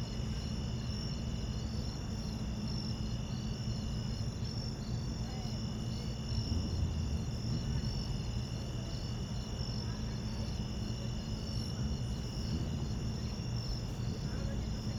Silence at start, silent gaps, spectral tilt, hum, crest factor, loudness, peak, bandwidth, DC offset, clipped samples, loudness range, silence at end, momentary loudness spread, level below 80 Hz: 0 s; none; -6 dB/octave; none; 14 dB; -38 LUFS; -24 dBFS; 13 kHz; under 0.1%; under 0.1%; 1 LU; 0 s; 3 LU; -42 dBFS